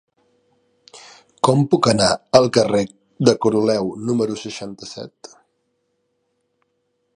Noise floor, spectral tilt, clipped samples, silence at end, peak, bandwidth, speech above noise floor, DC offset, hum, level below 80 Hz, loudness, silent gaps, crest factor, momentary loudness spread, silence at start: -70 dBFS; -5.5 dB/octave; under 0.1%; 2.1 s; 0 dBFS; 11 kHz; 52 dB; under 0.1%; none; -54 dBFS; -18 LUFS; none; 20 dB; 17 LU; 0.95 s